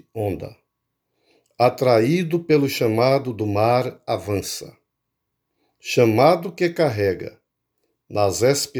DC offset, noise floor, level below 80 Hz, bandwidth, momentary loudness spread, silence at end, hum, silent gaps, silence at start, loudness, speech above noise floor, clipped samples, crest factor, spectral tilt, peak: under 0.1%; -78 dBFS; -58 dBFS; over 20 kHz; 13 LU; 0 s; none; none; 0.15 s; -20 LUFS; 59 dB; under 0.1%; 20 dB; -5.5 dB/octave; -2 dBFS